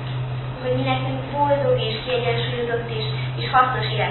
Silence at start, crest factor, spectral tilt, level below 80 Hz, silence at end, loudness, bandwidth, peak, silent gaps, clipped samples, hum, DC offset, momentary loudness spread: 0 s; 18 dB; -11 dB/octave; -44 dBFS; 0 s; -22 LUFS; 4.3 kHz; -4 dBFS; none; under 0.1%; none; under 0.1%; 8 LU